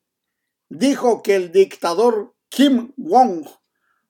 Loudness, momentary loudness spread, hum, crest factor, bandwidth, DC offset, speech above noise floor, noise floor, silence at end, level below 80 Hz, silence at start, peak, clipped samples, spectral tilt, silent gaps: -17 LUFS; 7 LU; none; 16 dB; 18.5 kHz; under 0.1%; 62 dB; -78 dBFS; 0.6 s; -82 dBFS; 0.7 s; -2 dBFS; under 0.1%; -4.5 dB/octave; none